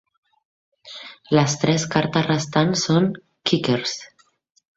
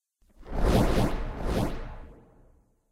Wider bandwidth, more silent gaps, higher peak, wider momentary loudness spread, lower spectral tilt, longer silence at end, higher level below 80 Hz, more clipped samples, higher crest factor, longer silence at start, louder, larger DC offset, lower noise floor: second, 8 kHz vs 16 kHz; neither; first, -2 dBFS vs -10 dBFS; about the same, 17 LU vs 18 LU; second, -5 dB/octave vs -6.5 dB/octave; about the same, 0.7 s vs 0.75 s; second, -58 dBFS vs -32 dBFS; neither; about the same, 20 dB vs 18 dB; first, 0.85 s vs 0.4 s; first, -21 LUFS vs -28 LUFS; neither; second, -41 dBFS vs -61 dBFS